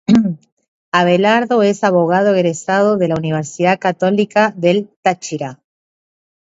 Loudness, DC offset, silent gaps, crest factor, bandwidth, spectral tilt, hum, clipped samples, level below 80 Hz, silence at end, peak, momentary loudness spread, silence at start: -15 LUFS; under 0.1%; 0.52-0.57 s, 0.68-0.92 s, 4.96-5.03 s; 16 dB; 8 kHz; -6 dB/octave; none; under 0.1%; -56 dBFS; 1 s; 0 dBFS; 9 LU; 0.1 s